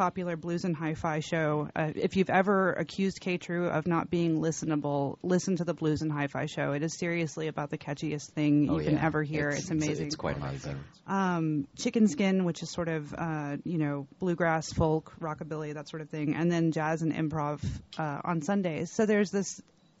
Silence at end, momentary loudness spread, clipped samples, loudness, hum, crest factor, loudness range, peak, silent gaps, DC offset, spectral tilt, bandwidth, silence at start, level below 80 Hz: 0.4 s; 10 LU; under 0.1%; -30 LUFS; none; 18 dB; 3 LU; -12 dBFS; none; under 0.1%; -6 dB/octave; 8 kHz; 0 s; -56 dBFS